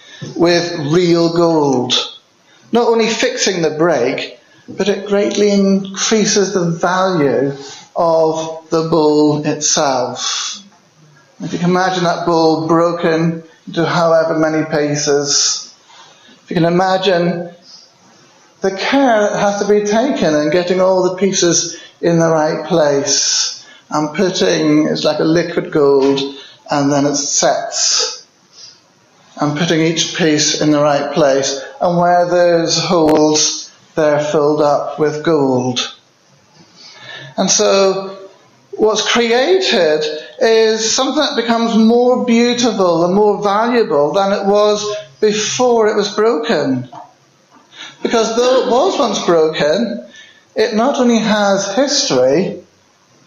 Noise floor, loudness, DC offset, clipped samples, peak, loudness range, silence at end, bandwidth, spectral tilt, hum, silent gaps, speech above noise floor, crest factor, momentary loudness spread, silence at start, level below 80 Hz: -51 dBFS; -14 LUFS; under 0.1%; under 0.1%; -2 dBFS; 3 LU; 0.65 s; 8 kHz; -4 dB/octave; none; none; 38 dB; 14 dB; 9 LU; 0.1 s; -56 dBFS